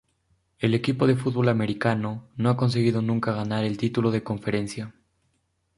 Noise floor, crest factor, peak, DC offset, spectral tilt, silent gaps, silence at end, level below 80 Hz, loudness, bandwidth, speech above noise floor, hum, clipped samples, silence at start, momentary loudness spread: -72 dBFS; 20 dB; -6 dBFS; under 0.1%; -7.5 dB/octave; none; 0.85 s; -58 dBFS; -25 LUFS; 11.5 kHz; 48 dB; none; under 0.1%; 0.6 s; 7 LU